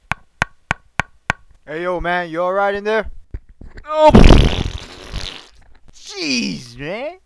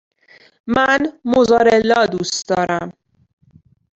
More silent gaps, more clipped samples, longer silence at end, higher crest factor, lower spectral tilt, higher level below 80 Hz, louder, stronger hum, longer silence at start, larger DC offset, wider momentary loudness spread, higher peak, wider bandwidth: neither; first, 0.1% vs under 0.1%; second, 0.1 s vs 1.05 s; about the same, 16 dB vs 16 dB; first, -5.5 dB/octave vs -4 dB/octave; first, -22 dBFS vs -50 dBFS; about the same, -17 LUFS vs -16 LUFS; neither; second, 0.1 s vs 0.65 s; neither; first, 22 LU vs 10 LU; about the same, 0 dBFS vs -2 dBFS; first, 11 kHz vs 8.2 kHz